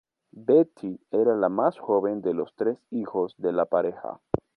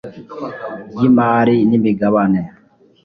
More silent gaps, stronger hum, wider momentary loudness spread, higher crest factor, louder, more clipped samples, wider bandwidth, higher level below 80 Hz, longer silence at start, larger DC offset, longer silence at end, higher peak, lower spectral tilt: neither; neither; second, 11 LU vs 17 LU; first, 20 dB vs 14 dB; second, -26 LUFS vs -14 LUFS; neither; about the same, 4.6 kHz vs 5 kHz; second, -60 dBFS vs -52 dBFS; first, 0.35 s vs 0.05 s; neither; second, 0.2 s vs 0.55 s; second, -6 dBFS vs -2 dBFS; about the same, -10 dB/octave vs -10 dB/octave